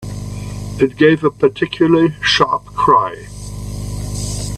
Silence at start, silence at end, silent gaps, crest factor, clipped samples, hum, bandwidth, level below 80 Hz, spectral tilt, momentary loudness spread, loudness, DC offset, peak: 0 s; 0 s; none; 16 dB; under 0.1%; 50 Hz at -35 dBFS; 14 kHz; -34 dBFS; -5 dB/octave; 15 LU; -15 LUFS; under 0.1%; 0 dBFS